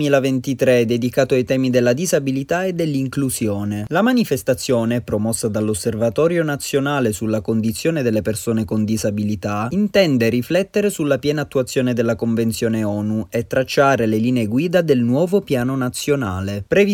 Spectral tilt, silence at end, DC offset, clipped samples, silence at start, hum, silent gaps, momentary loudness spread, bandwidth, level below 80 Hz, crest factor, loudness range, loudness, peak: -5.5 dB/octave; 0 s; under 0.1%; under 0.1%; 0 s; none; none; 5 LU; 18 kHz; -50 dBFS; 16 dB; 2 LU; -19 LUFS; -2 dBFS